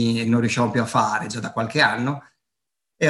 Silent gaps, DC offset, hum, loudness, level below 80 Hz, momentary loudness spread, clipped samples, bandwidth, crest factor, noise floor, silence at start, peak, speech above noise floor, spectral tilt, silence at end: none; under 0.1%; none; -21 LUFS; -62 dBFS; 9 LU; under 0.1%; 12 kHz; 18 dB; -85 dBFS; 0 s; -4 dBFS; 63 dB; -5 dB/octave; 0 s